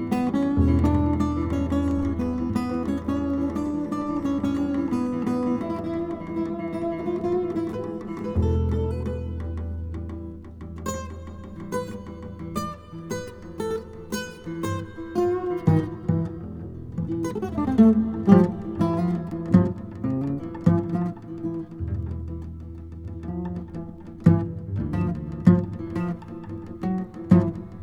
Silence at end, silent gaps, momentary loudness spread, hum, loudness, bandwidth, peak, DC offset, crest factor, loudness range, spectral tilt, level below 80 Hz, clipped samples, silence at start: 0 s; none; 16 LU; none; -25 LUFS; 16.5 kHz; -2 dBFS; under 0.1%; 22 dB; 11 LU; -8.5 dB/octave; -40 dBFS; under 0.1%; 0 s